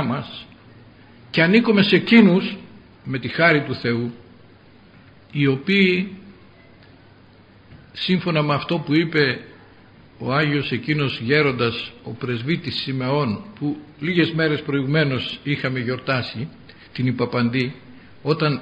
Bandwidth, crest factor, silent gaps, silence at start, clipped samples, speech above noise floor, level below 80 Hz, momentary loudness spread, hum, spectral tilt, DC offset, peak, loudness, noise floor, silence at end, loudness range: 8 kHz; 22 dB; none; 0 s; under 0.1%; 29 dB; -58 dBFS; 15 LU; none; -8 dB/octave; under 0.1%; 0 dBFS; -20 LUFS; -49 dBFS; 0 s; 6 LU